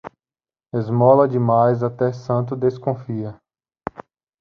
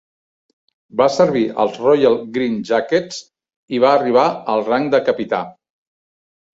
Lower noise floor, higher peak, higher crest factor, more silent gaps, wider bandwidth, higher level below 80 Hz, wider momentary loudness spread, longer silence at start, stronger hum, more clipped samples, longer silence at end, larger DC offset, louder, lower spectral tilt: about the same, under -90 dBFS vs under -90 dBFS; about the same, -2 dBFS vs -2 dBFS; about the same, 18 dB vs 16 dB; second, none vs 3.56-3.68 s; second, 6.6 kHz vs 7.8 kHz; about the same, -58 dBFS vs -62 dBFS; first, 20 LU vs 10 LU; second, 0.05 s vs 0.95 s; neither; neither; second, 0.4 s vs 1.05 s; neither; about the same, -19 LUFS vs -17 LUFS; first, -10 dB/octave vs -5.5 dB/octave